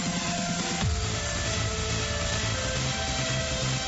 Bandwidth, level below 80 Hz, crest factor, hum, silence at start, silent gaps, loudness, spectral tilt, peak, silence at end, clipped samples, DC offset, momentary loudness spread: 8.2 kHz; -38 dBFS; 12 dB; none; 0 s; none; -28 LUFS; -3.5 dB/octave; -16 dBFS; 0 s; under 0.1%; under 0.1%; 1 LU